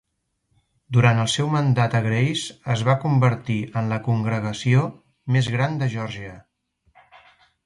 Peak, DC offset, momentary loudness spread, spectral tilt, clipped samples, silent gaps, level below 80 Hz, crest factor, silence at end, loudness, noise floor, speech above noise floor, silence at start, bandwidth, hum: -4 dBFS; under 0.1%; 10 LU; -6 dB/octave; under 0.1%; none; -56 dBFS; 18 dB; 1.25 s; -22 LUFS; -72 dBFS; 51 dB; 0.9 s; 11.5 kHz; none